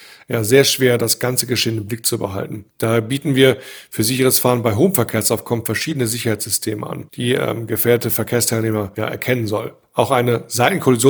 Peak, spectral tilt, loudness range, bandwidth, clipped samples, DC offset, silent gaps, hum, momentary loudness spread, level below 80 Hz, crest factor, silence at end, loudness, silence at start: 0 dBFS; -4 dB/octave; 2 LU; over 20 kHz; under 0.1%; under 0.1%; none; none; 10 LU; -56 dBFS; 18 dB; 0 s; -17 LUFS; 0 s